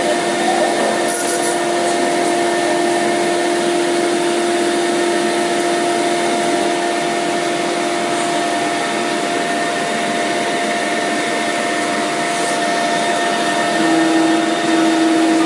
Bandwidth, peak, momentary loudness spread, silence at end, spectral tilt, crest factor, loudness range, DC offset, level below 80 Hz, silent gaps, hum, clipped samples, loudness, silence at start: 11.5 kHz; -4 dBFS; 3 LU; 0 s; -3 dB/octave; 12 dB; 2 LU; under 0.1%; -70 dBFS; none; none; under 0.1%; -16 LUFS; 0 s